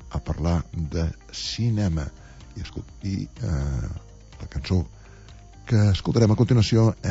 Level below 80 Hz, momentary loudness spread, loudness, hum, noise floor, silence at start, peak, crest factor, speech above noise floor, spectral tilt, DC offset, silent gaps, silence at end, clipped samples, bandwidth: -36 dBFS; 18 LU; -24 LUFS; none; -45 dBFS; 0 s; -6 dBFS; 18 dB; 22 dB; -7 dB/octave; under 0.1%; none; 0 s; under 0.1%; 8 kHz